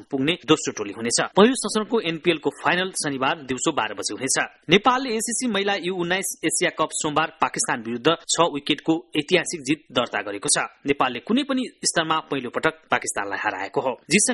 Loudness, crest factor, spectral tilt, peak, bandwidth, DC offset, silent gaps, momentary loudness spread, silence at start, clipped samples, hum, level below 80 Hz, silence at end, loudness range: -22 LUFS; 22 dB; -3 dB/octave; 0 dBFS; 12 kHz; under 0.1%; none; 7 LU; 0 s; under 0.1%; none; -62 dBFS; 0 s; 2 LU